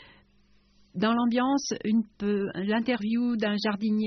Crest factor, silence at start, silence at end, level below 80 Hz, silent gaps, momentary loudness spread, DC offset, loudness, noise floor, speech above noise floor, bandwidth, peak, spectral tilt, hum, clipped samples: 14 dB; 0 s; 0 s; -64 dBFS; none; 4 LU; under 0.1%; -27 LUFS; -62 dBFS; 36 dB; 6.4 kHz; -14 dBFS; -4.5 dB/octave; none; under 0.1%